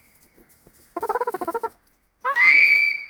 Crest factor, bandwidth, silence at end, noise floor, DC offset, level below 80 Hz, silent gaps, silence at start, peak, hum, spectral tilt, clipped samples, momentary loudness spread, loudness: 18 dB; over 20 kHz; 0 s; -63 dBFS; under 0.1%; -66 dBFS; none; 0.95 s; -4 dBFS; none; -1.5 dB/octave; under 0.1%; 20 LU; -17 LUFS